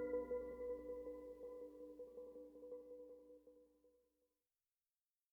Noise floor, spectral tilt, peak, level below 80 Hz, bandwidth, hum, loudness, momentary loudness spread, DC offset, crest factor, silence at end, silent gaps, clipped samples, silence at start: under -90 dBFS; -8 dB/octave; -34 dBFS; -74 dBFS; 3.3 kHz; none; -52 LUFS; 16 LU; under 0.1%; 18 dB; 1.45 s; none; under 0.1%; 0 s